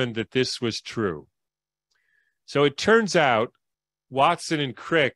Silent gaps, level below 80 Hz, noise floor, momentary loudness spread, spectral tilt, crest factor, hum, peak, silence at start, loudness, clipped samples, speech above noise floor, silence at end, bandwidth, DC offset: none; -62 dBFS; -88 dBFS; 10 LU; -4.5 dB/octave; 20 dB; none; -6 dBFS; 0 s; -23 LUFS; under 0.1%; 66 dB; 0.05 s; 12 kHz; under 0.1%